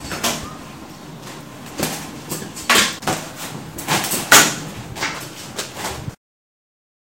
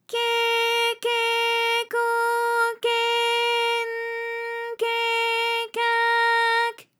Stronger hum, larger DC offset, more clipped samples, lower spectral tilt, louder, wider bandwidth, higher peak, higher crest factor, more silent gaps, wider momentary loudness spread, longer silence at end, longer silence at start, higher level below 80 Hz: neither; first, 0.2% vs under 0.1%; neither; first, -1.5 dB/octave vs 2 dB/octave; first, -18 LUFS vs -22 LUFS; about the same, 17 kHz vs 18 kHz; first, 0 dBFS vs -10 dBFS; first, 22 dB vs 12 dB; neither; first, 24 LU vs 8 LU; first, 1 s vs 0.2 s; about the same, 0 s vs 0.1 s; first, -48 dBFS vs under -90 dBFS